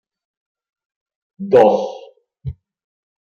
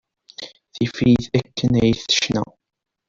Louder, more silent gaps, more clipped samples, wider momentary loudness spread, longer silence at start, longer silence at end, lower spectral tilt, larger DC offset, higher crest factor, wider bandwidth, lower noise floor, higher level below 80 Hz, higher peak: first, -14 LUFS vs -19 LUFS; neither; neither; about the same, 21 LU vs 19 LU; first, 1.4 s vs 0.4 s; about the same, 0.7 s vs 0.65 s; first, -7.5 dB/octave vs -5 dB/octave; neither; about the same, 20 dB vs 16 dB; about the same, 7 kHz vs 7.6 kHz; about the same, -42 dBFS vs -40 dBFS; about the same, -50 dBFS vs -46 dBFS; about the same, -2 dBFS vs -4 dBFS